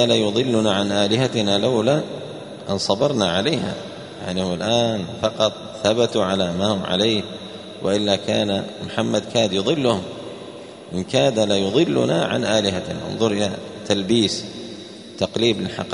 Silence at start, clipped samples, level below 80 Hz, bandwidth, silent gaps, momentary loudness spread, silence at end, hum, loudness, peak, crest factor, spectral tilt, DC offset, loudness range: 0 s; under 0.1%; -56 dBFS; 10.5 kHz; none; 14 LU; 0 s; none; -20 LUFS; -2 dBFS; 20 dB; -5 dB/octave; under 0.1%; 2 LU